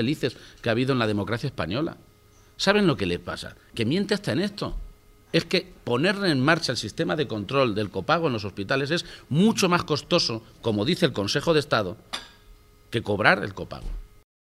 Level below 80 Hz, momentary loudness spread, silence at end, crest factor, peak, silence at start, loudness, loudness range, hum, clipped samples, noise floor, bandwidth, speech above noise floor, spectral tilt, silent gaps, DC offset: -46 dBFS; 13 LU; 0.35 s; 24 dB; -2 dBFS; 0 s; -25 LUFS; 3 LU; none; under 0.1%; -55 dBFS; 15.5 kHz; 30 dB; -5 dB/octave; none; under 0.1%